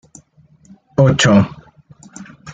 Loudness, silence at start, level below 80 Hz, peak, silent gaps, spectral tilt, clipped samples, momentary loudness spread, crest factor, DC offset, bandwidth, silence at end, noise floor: -14 LUFS; 1 s; -48 dBFS; -2 dBFS; none; -5.5 dB/octave; under 0.1%; 26 LU; 16 dB; under 0.1%; 9.4 kHz; 0 s; -50 dBFS